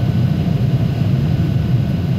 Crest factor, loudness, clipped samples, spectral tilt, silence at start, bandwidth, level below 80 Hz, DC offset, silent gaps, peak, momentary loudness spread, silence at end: 10 dB; -17 LUFS; under 0.1%; -9 dB/octave; 0 s; 13.5 kHz; -32 dBFS; under 0.1%; none; -6 dBFS; 1 LU; 0 s